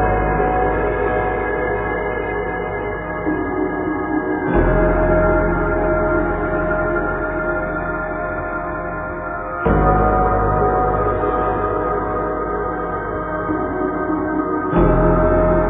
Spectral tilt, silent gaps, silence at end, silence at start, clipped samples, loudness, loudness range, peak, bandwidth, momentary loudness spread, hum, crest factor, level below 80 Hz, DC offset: -12.5 dB/octave; none; 0 s; 0 s; under 0.1%; -19 LUFS; 3 LU; -2 dBFS; 3.7 kHz; 8 LU; none; 16 dB; -26 dBFS; under 0.1%